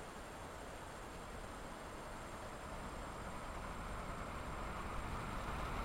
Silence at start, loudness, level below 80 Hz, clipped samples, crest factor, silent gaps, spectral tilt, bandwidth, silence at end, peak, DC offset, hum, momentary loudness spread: 0 s; -48 LUFS; -52 dBFS; under 0.1%; 16 dB; none; -5 dB/octave; 16 kHz; 0 s; -30 dBFS; under 0.1%; none; 6 LU